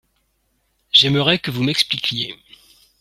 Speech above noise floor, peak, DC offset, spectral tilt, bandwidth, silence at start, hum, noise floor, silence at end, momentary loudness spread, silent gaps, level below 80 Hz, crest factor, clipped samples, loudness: 46 dB; 0 dBFS; under 0.1%; -4 dB/octave; 15.5 kHz; 0.95 s; none; -67 dBFS; 0.65 s; 10 LU; none; -56 dBFS; 20 dB; under 0.1%; -17 LUFS